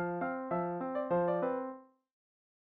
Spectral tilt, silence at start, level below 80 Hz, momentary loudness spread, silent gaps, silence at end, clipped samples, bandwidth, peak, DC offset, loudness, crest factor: -8 dB/octave; 0 s; -72 dBFS; 9 LU; none; 0.8 s; under 0.1%; 4 kHz; -22 dBFS; under 0.1%; -35 LUFS; 14 dB